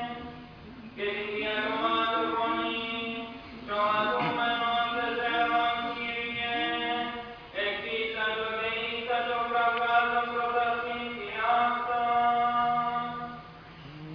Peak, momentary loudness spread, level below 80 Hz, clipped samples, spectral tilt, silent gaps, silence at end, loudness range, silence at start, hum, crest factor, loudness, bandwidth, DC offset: -12 dBFS; 15 LU; -60 dBFS; under 0.1%; -6 dB/octave; none; 0 s; 3 LU; 0 s; none; 16 dB; -28 LUFS; 5.4 kHz; under 0.1%